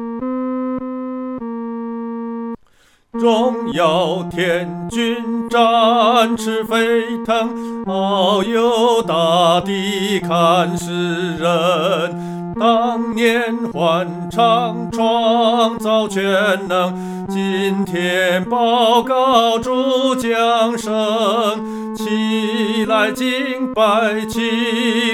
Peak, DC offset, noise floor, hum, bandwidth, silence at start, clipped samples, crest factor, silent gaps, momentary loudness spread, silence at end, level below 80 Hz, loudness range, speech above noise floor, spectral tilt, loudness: 0 dBFS; under 0.1%; -53 dBFS; none; 16.5 kHz; 0 s; under 0.1%; 16 dB; none; 11 LU; 0 s; -52 dBFS; 3 LU; 37 dB; -5 dB/octave; -17 LUFS